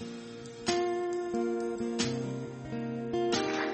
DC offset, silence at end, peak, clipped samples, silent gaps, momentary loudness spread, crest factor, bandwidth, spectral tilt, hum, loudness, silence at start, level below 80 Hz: under 0.1%; 0 s; -16 dBFS; under 0.1%; none; 9 LU; 18 dB; 8.4 kHz; -4.5 dB/octave; none; -33 LUFS; 0 s; -62 dBFS